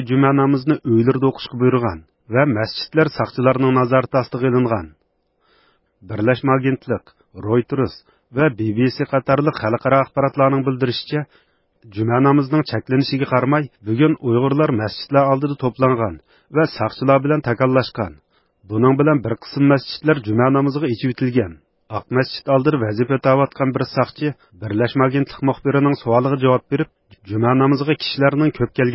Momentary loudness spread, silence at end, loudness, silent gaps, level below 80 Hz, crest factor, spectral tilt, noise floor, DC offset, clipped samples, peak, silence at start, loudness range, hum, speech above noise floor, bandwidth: 9 LU; 0 s; -18 LUFS; none; -50 dBFS; 18 dB; -11.5 dB/octave; -65 dBFS; under 0.1%; under 0.1%; 0 dBFS; 0 s; 2 LU; none; 48 dB; 5.8 kHz